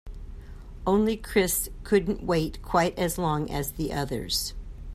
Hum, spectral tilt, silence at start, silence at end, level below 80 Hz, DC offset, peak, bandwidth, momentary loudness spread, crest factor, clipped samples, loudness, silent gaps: none; -4.5 dB/octave; 0.05 s; 0 s; -40 dBFS; under 0.1%; -10 dBFS; 16 kHz; 20 LU; 18 dB; under 0.1%; -27 LUFS; none